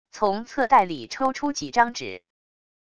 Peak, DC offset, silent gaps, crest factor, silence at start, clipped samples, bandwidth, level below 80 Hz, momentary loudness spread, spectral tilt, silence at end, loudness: -6 dBFS; 0.4%; none; 20 dB; 0.15 s; under 0.1%; 11 kHz; -60 dBFS; 14 LU; -3.5 dB/octave; 0.8 s; -23 LUFS